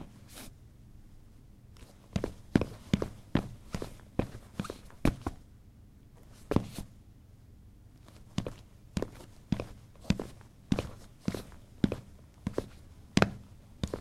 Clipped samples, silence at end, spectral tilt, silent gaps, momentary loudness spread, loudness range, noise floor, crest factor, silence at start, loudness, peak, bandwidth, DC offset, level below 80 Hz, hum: under 0.1%; 0 s; -6.5 dB/octave; none; 25 LU; 6 LU; -55 dBFS; 36 dB; 0 s; -36 LUFS; -2 dBFS; 16 kHz; under 0.1%; -48 dBFS; none